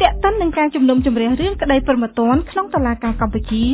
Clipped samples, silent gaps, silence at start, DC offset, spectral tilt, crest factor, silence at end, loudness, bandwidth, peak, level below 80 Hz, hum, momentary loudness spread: under 0.1%; none; 0 s; under 0.1%; -10.5 dB/octave; 16 dB; 0 s; -17 LUFS; 4 kHz; 0 dBFS; -28 dBFS; none; 5 LU